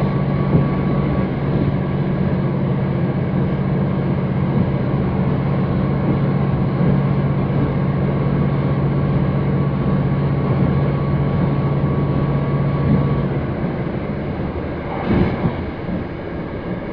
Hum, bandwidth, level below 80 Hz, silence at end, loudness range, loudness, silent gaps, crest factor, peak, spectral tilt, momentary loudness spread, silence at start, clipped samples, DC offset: none; 5 kHz; -32 dBFS; 0 s; 2 LU; -19 LUFS; none; 16 dB; -2 dBFS; -11.5 dB/octave; 7 LU; 0 s; under 0.1%; under 0.1%